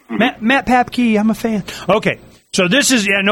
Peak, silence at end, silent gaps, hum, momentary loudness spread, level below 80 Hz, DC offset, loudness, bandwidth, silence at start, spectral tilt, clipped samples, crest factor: -2 dBFS; 0 s; none; none; 9 LU; -46 dBFS; under 0.1%; -15 LUFS; 16.5 kHz; 0.1 s; -3.5 dB/octave; under 0.1%; 14 dB